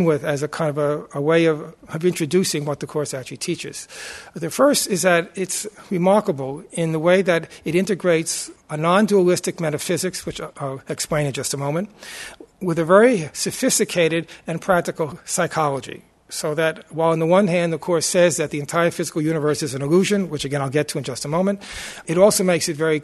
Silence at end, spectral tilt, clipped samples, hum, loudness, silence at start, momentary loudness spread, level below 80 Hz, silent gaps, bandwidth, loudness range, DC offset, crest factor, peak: 0 s; -4.5 dB/octave; under 0.1%; none; -20 LUFS; 0 s; 13 LU; -56 dBFS; none; 12.5 kHz; 3 LU; under 0.1%; 20 dB; 0 dBFS